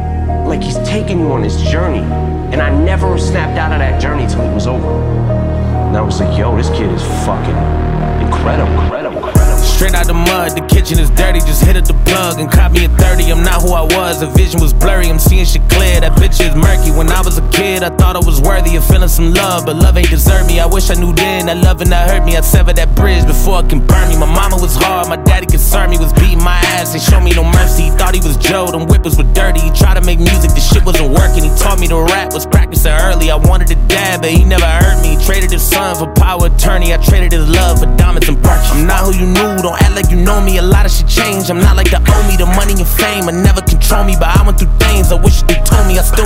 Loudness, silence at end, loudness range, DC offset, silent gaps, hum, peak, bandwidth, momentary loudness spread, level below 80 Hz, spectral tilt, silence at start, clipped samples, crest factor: -11 LUFS; 0 s; 3 LU; under 0.1%; none; none; 0 dBFS; 16.5 kHz; 5 LU; -10 dBFS; -5 dB/octave; 0 s; under 0.1%; 8 dB